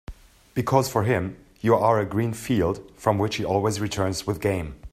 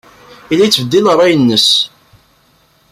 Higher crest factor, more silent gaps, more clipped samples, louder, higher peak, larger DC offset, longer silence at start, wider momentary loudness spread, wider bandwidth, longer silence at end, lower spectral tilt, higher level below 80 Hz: first, 20 dB vs 14 dB; neither; neither; second, -24 LUFS vs -10 LUFS; second, -4 dBFS vs 0 dBFS; neither; second, 0.1 s vs 0.5 s; about the same, 7 LU vs 6 LU; about the same, 15.5 kHz vs 16 kHz; second, 0.05 s vs 1.05 s; first, -6 dB/octave vs -4 dB/octave; about the same, -48 dBFS vs -52 dBFS